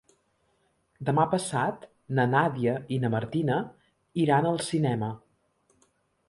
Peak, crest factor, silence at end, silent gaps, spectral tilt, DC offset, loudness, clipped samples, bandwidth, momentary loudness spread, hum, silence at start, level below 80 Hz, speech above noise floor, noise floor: -10 dBFS; 18 dB; 1.1 s; none; -6.5 dB/octave; under 0.1%; -27 LUFS; under 0.1%; 11.5 kHz; 11 LU; none; 1 s; -64 dBFS; 45 dB; -71 dBFS